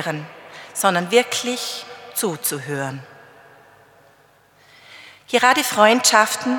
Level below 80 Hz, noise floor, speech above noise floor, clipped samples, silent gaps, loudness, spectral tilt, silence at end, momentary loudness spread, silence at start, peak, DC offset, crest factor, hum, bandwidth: -76 dBFS; -54 dBFS; 36 dB; under 0.1%; none; -18 LUFS; -2.5 dB/octave; 0 s; 17 LU; 0 s; 0 dBFS; under 0.1%; 22 dB; none; 19 kHz